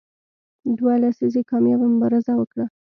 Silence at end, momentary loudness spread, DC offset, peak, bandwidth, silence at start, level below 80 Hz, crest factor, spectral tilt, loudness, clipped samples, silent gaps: 0.2 s; 8 LU; under 0.1%; -10 dBFS; 5.6 kHz; 0.65 s; -68 dBFS; 12 dB; -10 dB/octave; -20 LUFS; under 0.1%; 2.47-2.51 s